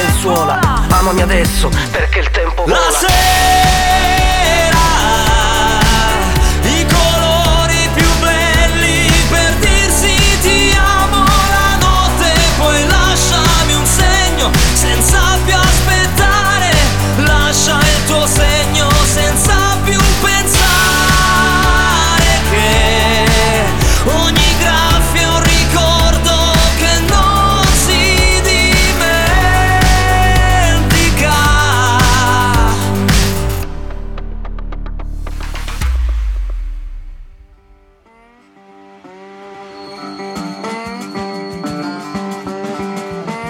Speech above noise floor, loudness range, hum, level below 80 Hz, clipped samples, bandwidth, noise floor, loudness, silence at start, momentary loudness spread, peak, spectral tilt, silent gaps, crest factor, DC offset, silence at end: 35 dB; 13 LU; none; -16 dBFS; under 0.1%; over 20 kHz; -47 dBFS; -11 LUFS; 0 s; 14 LU; 0 dBFS; -3.5 dB/octave; none; 12 dB; 6%; 0 s